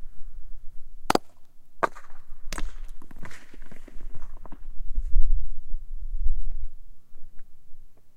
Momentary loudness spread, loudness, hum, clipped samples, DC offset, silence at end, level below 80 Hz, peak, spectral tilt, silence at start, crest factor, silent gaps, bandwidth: 23 LU; -33 LUFS; none; under 0.1%; under 0.1%; 0.05 s; -28 dBFS; -2 dBFS; -5 dB/octave; 0 s; 20 dB; none; 8.8 kHz